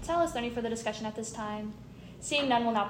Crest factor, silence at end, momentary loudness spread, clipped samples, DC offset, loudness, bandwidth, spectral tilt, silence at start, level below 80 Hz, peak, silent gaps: 18 dB; 0 s; 15 LU; under 0.1%; under 0.1%; -32 LUFS; 16 kHz; -3.5 dB/octave; 0 s; -56 dBFS; -14 dBFS; none